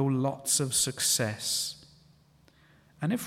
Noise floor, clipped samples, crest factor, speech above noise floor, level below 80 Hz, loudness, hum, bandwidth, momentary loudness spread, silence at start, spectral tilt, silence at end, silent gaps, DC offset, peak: -62 dBFS; under 0.1%; 18 dB; 33 dB; -66 dBFS; -28 LUFS; none; 17.5 kHz; 11 LU; 0 s; -3 dB/octave; 0 s; none; under 0.1%; -14 dBFS